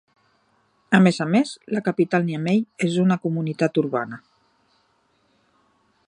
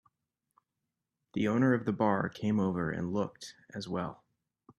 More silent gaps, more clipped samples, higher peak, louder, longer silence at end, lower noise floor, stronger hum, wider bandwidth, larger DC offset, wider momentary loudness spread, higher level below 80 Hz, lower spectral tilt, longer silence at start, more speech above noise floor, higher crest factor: neither; neither; first, -2 dBFS vs -14 dBFS; first, -21 LUFS vs -32 LUFS; first, 1.9 s vs 0.65 s; second, -65 dBFS vs -87 dBFS; neither; about the same, 10 kHz vs 11 kHz; neither; second, 8 LU vs 14 LU; about the same, -68 dBFS vs -66 dBFS; about the same, -7 dB/octave vs -7 dB/octave; second, 0.9 s vs 1.35 s; second, 44 dB vs 56 dB; about the same, 22 dB vs 20 dB